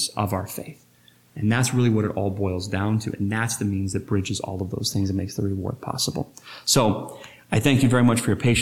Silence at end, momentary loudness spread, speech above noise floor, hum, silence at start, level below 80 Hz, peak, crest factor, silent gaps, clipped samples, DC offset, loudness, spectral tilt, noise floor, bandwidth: 0 s; 12 LU; 27 dB; none; 0 s; -50 dBFS; -6 dBFS; 18 dB; none; under 0.1%; under 0.1%; -23 LUFS; -5 dB/octave; -50 dBFS; 16.5 kHz